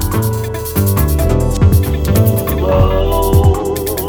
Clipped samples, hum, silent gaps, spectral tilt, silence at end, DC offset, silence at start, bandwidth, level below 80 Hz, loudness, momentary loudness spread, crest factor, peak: under 0.1%; none; none; -6.5 dB/octave; 0 s; under 0.1%; 0 s; 20 kHz; -18 dBFS; -13 LUFS; 5 LU; 12 dB; 0 dBFS